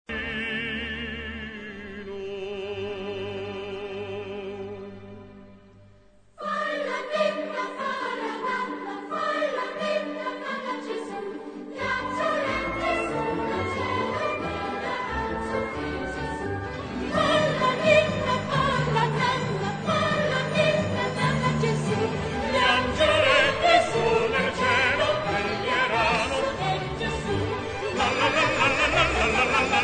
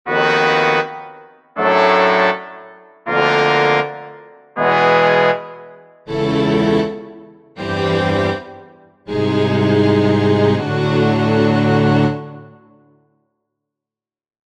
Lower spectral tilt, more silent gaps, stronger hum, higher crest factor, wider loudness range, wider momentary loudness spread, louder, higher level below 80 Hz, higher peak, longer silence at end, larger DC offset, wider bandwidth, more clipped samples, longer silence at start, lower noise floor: second, -4.5 dB/octave vs -7 dB/octave; neither; neither; about the same, 20 dB vs 16 dB; first, 12 LU vs 4 LU; about the same, 14 LU vs 16 LU; second, -25 LUFS vs -15 LUFS; about the same, -46 dBFS vs -50 dBFS; second, -6 dBFS vs 0 dBFS; second, 0 s vs 2.1 s; neither; about the same, 9.4 kHz vs 9.4 kHz; neither; about the same, 0.1 s vs 0.05 s; second, -54 dBFS vs under -90 dBFS